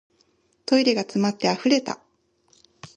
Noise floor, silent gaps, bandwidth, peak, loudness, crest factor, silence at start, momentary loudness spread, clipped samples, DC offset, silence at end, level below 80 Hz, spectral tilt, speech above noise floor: -65 dBFS; none; 9.8 kHz; -4 dBFS; -22 LUFS; 20 dB; 0.7 s; 15 LU; under 0.1%; under 0.1%; 0.1 s; -70 dBFS; -4.5 dB/octave; 44 dB